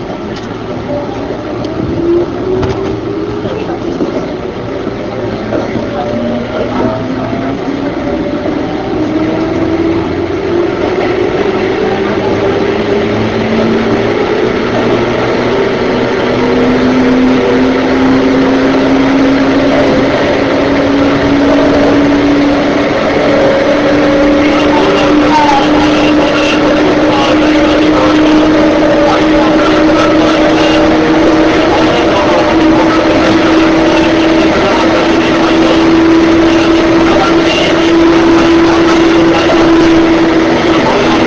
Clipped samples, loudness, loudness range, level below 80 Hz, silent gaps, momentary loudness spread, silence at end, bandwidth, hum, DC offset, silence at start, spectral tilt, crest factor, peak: under 0.1%; -9 LUFS; 8 LU; -30 dBFS; none; 8 LU; 0 s; 8 kHz; none; under 0.1%; 0 s; -6 dB/octave; 8 dB; 0 dBFS